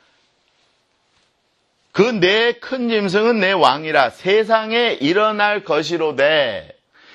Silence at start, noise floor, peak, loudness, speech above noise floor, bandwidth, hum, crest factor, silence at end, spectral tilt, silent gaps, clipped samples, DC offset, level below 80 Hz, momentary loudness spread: 1.95 s; -65 dBFS; 0 dBFS; -16 LUFS; 48 dB; 11 kHz; none; 18 dB; 0.5 s; -5 dB/octave; none; under 0.1%; under 0.1%; -62 dBFS; 6 LU